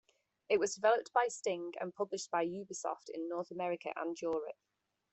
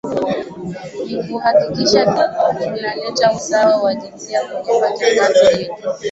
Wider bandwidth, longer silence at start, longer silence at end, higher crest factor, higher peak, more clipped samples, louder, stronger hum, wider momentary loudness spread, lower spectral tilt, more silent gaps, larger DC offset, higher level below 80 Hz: about the same, 8.4 kHz vs 8.2 kHz; first, 0.5 s vs 0.05 s; first, 0.6 s vs 0 s; first, 20 dB vs 14 dB; second, -16 dBFS vs -2 dBFS; neither; second, -37 LUFS vs -16 LUFS; neither; about the same, 10 LU vs 12 LU; about the same, -3.5 dB/octave vs -4 dB/octave; neither; neither; second, -82 dBFS vs -54 dBFS